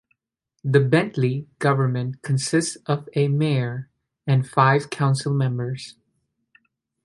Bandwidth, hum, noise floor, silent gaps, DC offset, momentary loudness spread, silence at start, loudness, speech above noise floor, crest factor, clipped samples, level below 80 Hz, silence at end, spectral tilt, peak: 11.5 kHz; none; -78 dBFS; none; under 0.1%; 12 LU; 0.65 s; -22 LUFS; 57 dB; 20 dB; under 0.1%; -62 dBFS; 1.15 s; -6 dB/octave; -2 dBFS